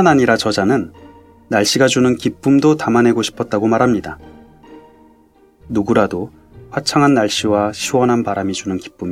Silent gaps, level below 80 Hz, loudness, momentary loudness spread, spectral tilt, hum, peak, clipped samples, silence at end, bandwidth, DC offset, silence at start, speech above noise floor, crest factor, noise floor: none; -48 dBFS; -15 LUFS; 11 LU; -5 dB/octave; none; 0 dBFS; under 0.1%; 0 s; 15.5 kHz; under 0.1%; 0 s; 36 dB; 16 dB; -50 dBFS